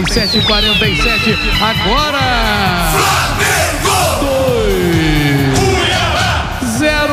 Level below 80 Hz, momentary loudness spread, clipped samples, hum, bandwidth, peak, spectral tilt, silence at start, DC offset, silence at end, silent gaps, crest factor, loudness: -22 dBFS; 3 LU; under 0.1%; none; 16 kHz; 0 dBFS; -4 dB/octave; 0 s; under 0.1%; 0 s; none; 12 dB; -12 LUFS